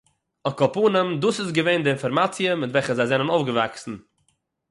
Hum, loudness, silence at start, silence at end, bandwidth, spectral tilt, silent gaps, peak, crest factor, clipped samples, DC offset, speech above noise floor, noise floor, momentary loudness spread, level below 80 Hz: none; -22 LUFS; 0.45 s; 0.7 s; 11.5 kHz; -5.5 dB/octave; none; -6 dBFS; 16 dB; under 0.1%; under 0.1%; 48 dB; -70 dBFS; 10 LU; -64 dBFS